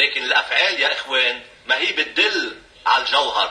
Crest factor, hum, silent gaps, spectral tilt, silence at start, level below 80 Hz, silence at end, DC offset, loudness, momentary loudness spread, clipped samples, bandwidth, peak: 16 dB; none; none; 0 dB/octave; 0 s; -60 dBFS; 0 s; under 0.1%; -18 LUFS; 8 LU; under 0.1%; 11 kHz; -2 dBFS